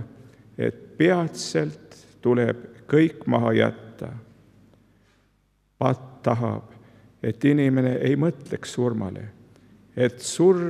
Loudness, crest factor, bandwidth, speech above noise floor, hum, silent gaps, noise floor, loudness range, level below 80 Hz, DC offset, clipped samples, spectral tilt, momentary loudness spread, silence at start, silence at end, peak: -24 LUFS; 20 dB; 13 kHz; 43 dB; none; none; -66 dBFS; 6 LU; -66 dBFS; under 0.1%; under 0.1%; -6.5 dB/octave; 17 LU; 0 s; 0 s; -4 dBFS